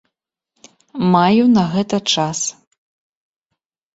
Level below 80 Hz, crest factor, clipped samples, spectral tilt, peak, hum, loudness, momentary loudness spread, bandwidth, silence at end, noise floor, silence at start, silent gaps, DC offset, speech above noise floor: -56 dBFS; 16 dB; under 0.1%; -4.5 dB/octave; -2 dBFS; none; -16 LUFS; 10 LU; 8 kHz; 1.45 s; -78 dBFS; 0.95 s; none; under 0.1%; 63 dB